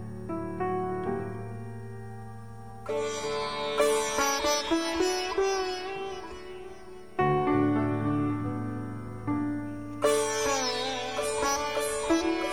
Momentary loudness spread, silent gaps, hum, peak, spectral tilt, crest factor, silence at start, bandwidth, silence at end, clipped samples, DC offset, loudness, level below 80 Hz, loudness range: 16 LU; none; none; -12 dBFS; -4 dB/octave; 18 dB; 0 s; 17.5 kHz; 0 s; under 0.1%; 0.5%; -29 LUFS; -54 dBFS; 4 LU